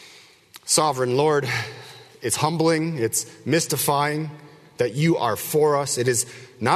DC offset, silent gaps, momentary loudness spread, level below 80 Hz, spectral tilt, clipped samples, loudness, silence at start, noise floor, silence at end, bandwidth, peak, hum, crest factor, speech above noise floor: under 0.1%; none; 11 LU; -62 dBFS; -4 dB/octave; under 0.1%; -22 LUFS; 0 s; -49 dBFS; 0 s; 13.5 kHz; -4 dBFS; none; 18 dB; 28 dB